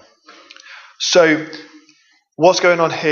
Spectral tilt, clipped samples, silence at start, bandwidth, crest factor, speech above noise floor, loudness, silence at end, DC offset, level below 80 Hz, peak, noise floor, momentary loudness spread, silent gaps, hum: -3.5 dB/octave; under 0.1%; 0.7 s; 7.4 kHz; 18 dB; 41 dB; -14 LUFS; 0 s; under 0.1%; -66 dBFS; 0 dBFS; -55 dBFS; 15 LU; none; none